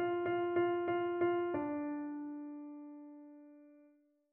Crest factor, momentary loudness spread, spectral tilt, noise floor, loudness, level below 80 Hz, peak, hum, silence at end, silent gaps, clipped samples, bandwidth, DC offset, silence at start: 16 dB; 20 LU; -5 dB/octave; -69 dBFS; -37 LUFS; -80 dBFS; -22 dBFS; none; 0.55 s; none; under 0.1%; 3.1 kHz; under 0.1%; 0 s